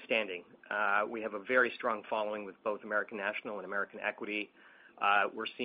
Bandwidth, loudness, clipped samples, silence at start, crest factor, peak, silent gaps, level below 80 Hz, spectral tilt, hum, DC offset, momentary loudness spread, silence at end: 5 kHz; -34 LUFS; under 0.1%; 0 s; 20 dB; -14 dBFS; none; -80 dBFS; -0.5 dB/octave; none; under 0.1%; 10 LU; 0 s